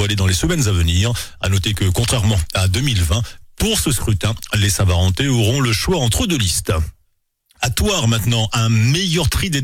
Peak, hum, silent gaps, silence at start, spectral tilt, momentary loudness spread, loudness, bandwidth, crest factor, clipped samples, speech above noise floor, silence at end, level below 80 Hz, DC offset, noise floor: -6 dBFS; none; none; 0 s; -4 dB/octave; 5 LU; -17 LUFS; 17 kHz; 10 dB; under 0.1%; 47 dB; 0 s; -28 dBFS; under 0.1%; -63 dBFS